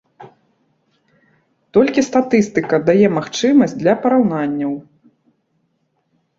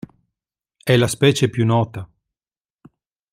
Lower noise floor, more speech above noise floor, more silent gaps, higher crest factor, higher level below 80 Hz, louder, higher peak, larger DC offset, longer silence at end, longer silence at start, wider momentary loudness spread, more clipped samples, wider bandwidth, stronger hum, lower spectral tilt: second, -66 dBFS vs under -90 dBFS; second, 52 dB vs over 73 dB; neither; about the same, 16 dB vs 20 dB; about the same, -58 dBFS vs -54 dBFS; about the same, -16 LUFS vs -18 LUFS; about the same, -2 dBFS vs -2 dBFS; neither; first, 1.55 s vs 1.25 s; second, 0.2 s vs 0.85 s; second, 7 LU vs 12 LU; neither; second, 7.8 kHz vs 15.5 kHz; neither; about the same, -6 dB/octave vs -5.5 dB/octave